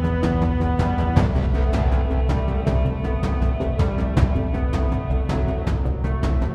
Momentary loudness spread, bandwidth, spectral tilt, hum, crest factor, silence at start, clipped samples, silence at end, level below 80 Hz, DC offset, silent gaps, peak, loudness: 4 LU; 7.2 kHz; -8.5 dB/octave; none; 18 dB; 0 s; under 0.1%; 0 s; -22 dBFS; under 0.1%; none; -2 dBFS; -22 LUFS